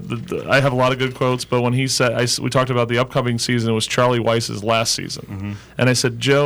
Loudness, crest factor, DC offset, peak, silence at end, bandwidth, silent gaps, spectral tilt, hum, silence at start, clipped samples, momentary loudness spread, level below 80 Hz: -18 LUFS; 14 dB; under 0.1%; -6 dBFS; 0 s; 19.5 kHz; none; -4.5 dB/octave; none; 0 s; under 0.1%; 9 LU; -50 dBFS